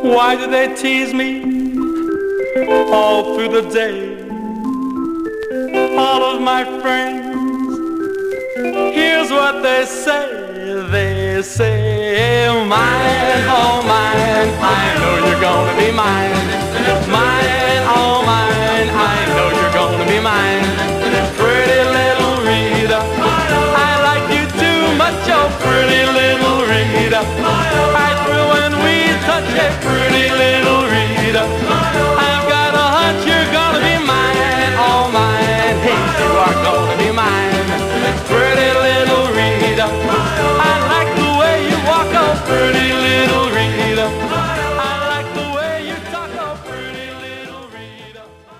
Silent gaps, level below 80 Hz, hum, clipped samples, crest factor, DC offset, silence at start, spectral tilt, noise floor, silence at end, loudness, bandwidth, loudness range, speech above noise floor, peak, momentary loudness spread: none; -34 dBFS; none; under 0.1%; 12 dB; 0.1%; 0 s; -4.5 dB/octave; -39 dBFS; 0.05 s; -14 LUFS; 16 kHz; 4 LU; 25 dB; -2 dBFS; 8 LU